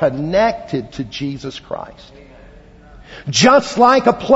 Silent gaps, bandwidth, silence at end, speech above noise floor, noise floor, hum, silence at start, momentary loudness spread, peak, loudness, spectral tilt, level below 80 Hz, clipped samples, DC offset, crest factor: none; 8 kHz; 0 s; 26 dB; -42 dBFS; none; 0 s; 18 LU; 0 dBFS; -15 LUFS; -4.5 dB/octave; -44 dBFS; under 0.1%; under 0.1%; 16 dB